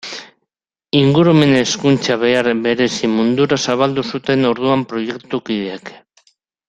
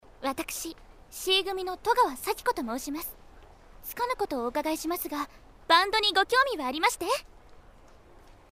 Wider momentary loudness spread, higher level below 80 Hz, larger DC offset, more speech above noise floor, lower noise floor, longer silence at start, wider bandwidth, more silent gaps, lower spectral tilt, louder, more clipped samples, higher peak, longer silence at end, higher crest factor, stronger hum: second, 12 LU vs 15 LU; about the same, -54 dBFS vs -54 dBFS; neither; first, 61 dB vs 25 dB; first, -76 dBFS vs -53 dBFS; second, 0.05 s vs 0.2 s; second, 9.6 kHz vs 16 kHz; neither; first, -5.5 dB/octave vs -1.5 dB/octave; first, -15 LUFS vs -28 LUFS; neither; first, 0 dBFS vs -6 dBFS; first, 0.7 s vs 0.2 s; second, 16 dB vs 22 dB; neither